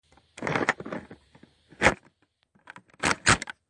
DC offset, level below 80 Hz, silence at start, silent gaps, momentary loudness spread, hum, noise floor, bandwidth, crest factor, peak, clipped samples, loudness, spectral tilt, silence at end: under 0.1%; -50 dBFS; 0.4 s; none; 16 LU; none; -68 dBFS; 11.5 kHz; 26 dB; -4 dBFS; under 0.1%; -26 LUFS; -3 dB/octave; 0.2 s